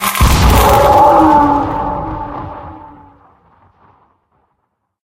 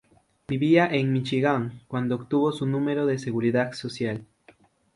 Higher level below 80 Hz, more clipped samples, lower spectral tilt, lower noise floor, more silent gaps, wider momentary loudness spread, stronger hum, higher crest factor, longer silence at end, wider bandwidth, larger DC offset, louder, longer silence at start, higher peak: first, -20 dBFS vs -64 dBFS; neither; second, -5.5 dB/octave vs -7 dB/octave; first, -68 dBFS vs -58 dBFS; neither; first, 20 LU vs 10 LU; neither; second, 12 dB vs 20 dB; first, 2.2 s vs 0.7 s; first, 17.5 kHz vs 11.5 kHz; neither; first, -10 LUFS vs -25 LUFS; second, 0 s vs 0.5 s; first, 0 dBFS vs -6 dBFS